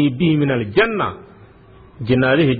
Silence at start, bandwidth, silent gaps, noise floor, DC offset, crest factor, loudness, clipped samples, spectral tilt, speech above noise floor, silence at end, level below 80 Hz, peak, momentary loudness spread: 0 s; 4.9 kHz; none; -45 dBFS; under 0.1%; 14 dB; -17 LUFS; under 0.1%; -10 dB/octave; 28 dB; 0 s; -46 dBFS; -4 dBFS; 12 LU